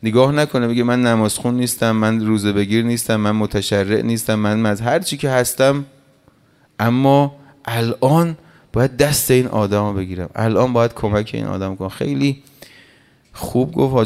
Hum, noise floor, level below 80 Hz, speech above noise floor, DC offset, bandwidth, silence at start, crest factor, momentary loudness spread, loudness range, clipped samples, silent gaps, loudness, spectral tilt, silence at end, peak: none; -54 dBFS; -46 dBFS; 38 dB; under 0.1%; 16 kHz; 0 s; 16 dB; 9 LU; 3 LU; under 0.1%; none; -17 LUFS; -5.5 dB/octave; 0 s; 0 dBFS